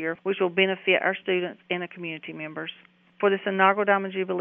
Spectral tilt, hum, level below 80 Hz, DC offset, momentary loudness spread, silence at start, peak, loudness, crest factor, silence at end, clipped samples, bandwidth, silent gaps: -2.5 dB/octave; none; -82 dBFS; under 0.1%; 13 LU; 0 s; -6 dBFS; -25 LUFS; 20 dB; 0 s; under 0.1%; 3.7 kHz; none